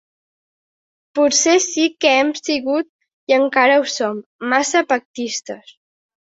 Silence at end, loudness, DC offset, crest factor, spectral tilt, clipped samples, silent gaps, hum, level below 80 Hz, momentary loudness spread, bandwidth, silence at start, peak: 0.8 s; -17 LUFS; under 0.1%; 18 dB; -1 dB/octave; under 0.1%; 2.89-2.99 s, 3.13-3.27 s, 4.26-4.39 s, 5.05-5.14 s; none; -66 dBFS; 13 LU; 8 kHz; 1.15 s; -2 dBFS